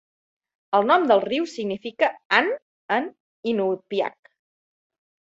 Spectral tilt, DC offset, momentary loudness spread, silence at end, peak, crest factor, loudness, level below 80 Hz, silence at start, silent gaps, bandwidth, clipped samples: -5 dB/octave; under 0.1%; 11 LU; 1.1 s; -2 dBFS; 22 dB; -23 LUFS; -72 dBFS; 0.7 s; 2.25-2.30 s, 2.62-2.89 s, 3.20-3.43 s; 8 kHz; under 0.1%